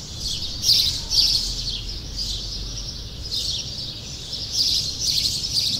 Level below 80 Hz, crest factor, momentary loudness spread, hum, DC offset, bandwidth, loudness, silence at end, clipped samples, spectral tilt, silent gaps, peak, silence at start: -36 dBFS; 20 dB; 13 LU; none; under 0.1%; 16 kHz; -21 LUFS; 0 s; under 0.1%; -1 dB/octave; none; -6 dBFS; 0 s